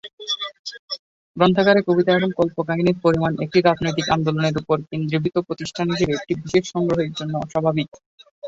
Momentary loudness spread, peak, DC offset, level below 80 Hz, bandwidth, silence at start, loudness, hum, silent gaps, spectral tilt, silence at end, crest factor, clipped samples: 12 LU; -2 dBFS; under 0.1%; -52 dBFS; 8 kHz; 0.05 s; -21 LUFS; none; 0.13-0.18 s, 0.59-0.64 s, 0.79-0.88 s, 0.99-1.34 s, 7.88-7.92 s, 8.06-8.18 s, 8.31-8.42 s; -6 dB/octave; 0 s; 20 dB; under 0.1%